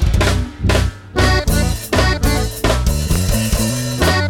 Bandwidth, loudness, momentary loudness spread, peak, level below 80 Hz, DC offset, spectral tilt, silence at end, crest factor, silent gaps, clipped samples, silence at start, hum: 18 kHz; -17 LUFS; 3 LU; -4 dBFS; -20 dBFS; under 0.1%; -4.5 dB/octave; 0 s; 12 dB; none; under 0.1%; 0 s; none